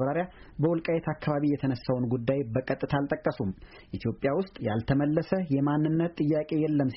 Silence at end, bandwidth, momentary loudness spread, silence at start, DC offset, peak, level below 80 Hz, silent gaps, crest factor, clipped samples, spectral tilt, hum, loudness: 0 s; 5.8 kHz; 7 LU; 0 s; under 0.1%; -14 dBFS; -54 dBFS; none; 14 dB; under 0.1%; -7.5 dB/octave; none; -29 LUFS